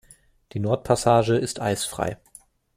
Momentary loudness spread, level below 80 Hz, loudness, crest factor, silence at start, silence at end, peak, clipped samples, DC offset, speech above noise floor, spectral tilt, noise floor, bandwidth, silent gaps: 12 LU; -52 dBFS; -23 LUFS; 20 dB; 0.55 s; 0.6 s; -4 dBFS; under 0.1%; under 0.1%; 31 dB; -5 dB/octave; -53 dBFS; 15.5 kHz; none